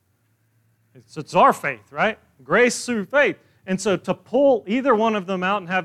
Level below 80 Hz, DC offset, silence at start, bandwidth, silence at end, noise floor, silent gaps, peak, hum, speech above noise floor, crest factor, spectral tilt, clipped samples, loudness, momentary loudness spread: -66 dBFS; under 0.1%; 1.15 s; 14 kHz; 0 s; -65 dBFS; none; -4 dBFS; none; 45 dB; 18 dB; -4.5 dB/octave; under 0.1%; -20 LUFS; 11 LU